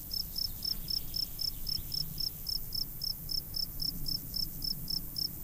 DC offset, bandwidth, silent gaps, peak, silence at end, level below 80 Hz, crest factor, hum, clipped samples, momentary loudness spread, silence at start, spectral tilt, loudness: under 0.1%; 16 kHz; none; -20 dBFS; 0 s; -44 dBFS; 16 dB; none; under 0.1%; 3 LU; 0 s; -2.5 dB/octave; -34 LUFS